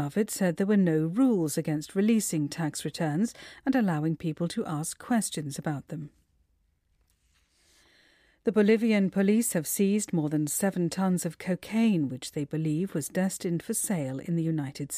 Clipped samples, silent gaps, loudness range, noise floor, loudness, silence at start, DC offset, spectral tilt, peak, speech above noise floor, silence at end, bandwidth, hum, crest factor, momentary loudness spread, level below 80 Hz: under 0.1%; none; 8 LU; -71 dBFS; -28 LUFS; 0 s; under 0.1%; -5.5 dB/octave; -12 dBFS; 43 dB; 0 s; 15.5 kHz; none; 16 dB; 9 LU; -68 dBFS